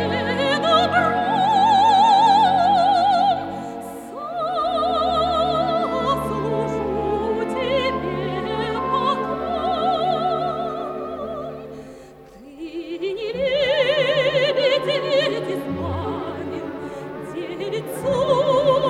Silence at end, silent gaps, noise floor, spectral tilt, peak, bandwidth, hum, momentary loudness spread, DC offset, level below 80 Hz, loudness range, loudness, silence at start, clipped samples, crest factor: 0 s; none; -43 dBFS; -5 dB/octave; -4 dBFS; 14 kHz; none; 15 LU; under 0.1%; -48 dBFS; 9 LU; -20 LUFS; 0 s; under 0.1%; 16 dB